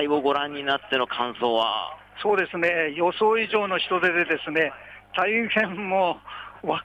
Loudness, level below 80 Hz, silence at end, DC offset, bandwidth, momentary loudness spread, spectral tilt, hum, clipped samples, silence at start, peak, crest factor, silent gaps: -24 LUFS; -62 dBFS; 0 s; under 0.1%; 9 kHz; 8 LU; -5.5 dB/octave; none; under 0.1%; 0 s; -10 dBFS; 14 dB; none